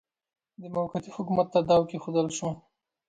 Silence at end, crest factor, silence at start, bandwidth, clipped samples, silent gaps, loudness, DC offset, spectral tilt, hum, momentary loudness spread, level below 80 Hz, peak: 0.5 s; 18 dB; 0.6 s; 9.2 kHz; under 0.1%; none; -28 LUFS; under 0.1%; -6 dB/octave; none; 12 LU; -62 dBFS; -12 dBFS